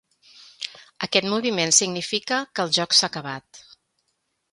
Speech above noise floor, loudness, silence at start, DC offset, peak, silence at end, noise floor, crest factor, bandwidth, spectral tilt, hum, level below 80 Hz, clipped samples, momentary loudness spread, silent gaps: 51 dB; -21 LUFS; 0.4 s; under 0.1%; -2 dBFS; 0.9 s; -74 dBFS; 24 dB; 11.5 kHz; -1.5 dB/octave; none; -70 dBFS; under 0.1%; 17 LU; none